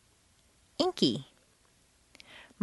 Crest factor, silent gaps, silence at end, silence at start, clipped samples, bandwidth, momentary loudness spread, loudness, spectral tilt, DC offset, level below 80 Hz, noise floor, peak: 26 dB; none; 0.2 s; 0.8 s; under 0.1%; 11.5 kHz; 24 LU; -30 LUFS; -5 dB/octave; under 0.1%; -70 dBFS; -66 dBFS; -10 dBFS